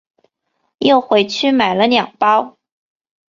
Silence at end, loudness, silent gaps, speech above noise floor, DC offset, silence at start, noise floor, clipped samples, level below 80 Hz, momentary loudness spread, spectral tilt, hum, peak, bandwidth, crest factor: 0.85 s; -14 LUFS; none; 56 dB; under 0.1%; 0.8 s; -69 dBFS; under 0.1%; -60 dBFS; 4 LU; -4.5 dB/octave; none; -2 dBFS; 7.6 kHz; 16 dB